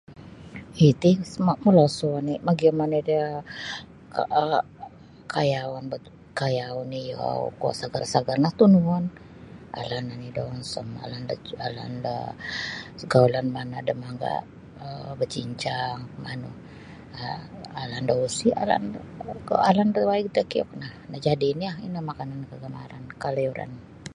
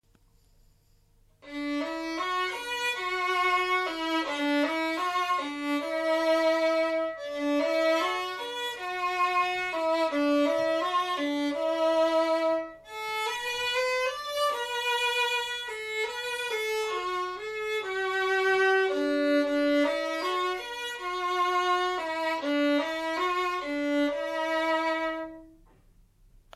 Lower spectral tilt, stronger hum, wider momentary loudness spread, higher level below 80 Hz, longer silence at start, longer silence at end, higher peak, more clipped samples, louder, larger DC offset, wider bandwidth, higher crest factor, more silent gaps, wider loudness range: first, -6.5 dB/octave vs -2 dB/octave; neither; first, 19 LU vs 8 LU; first, -56 dBFS vs -66 dBFS; second, 0.1 s vs 1.45 s; second, 0 s vs 1.05 s; first, -4 dBFS vs -14 dBFS; neither; first, -25 LUFS vs -28 LUFS; neither; second, 11.5 kHz vs 15 kHz; first, 22 dB vs 14 dB; neither; first, 9 LU vs 3 LU